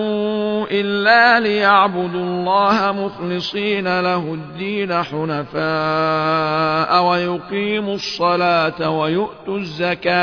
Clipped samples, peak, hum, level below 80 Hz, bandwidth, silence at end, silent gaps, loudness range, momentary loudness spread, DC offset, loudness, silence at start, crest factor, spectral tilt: under 0.1%; -2 dBFS; none; -54 dBFS; 5.4 kHz; 0 s; none; 4 LU; 9 LU; under 0.1%; -17 LUFS; 0 s; 16 dB; -6 dB/octave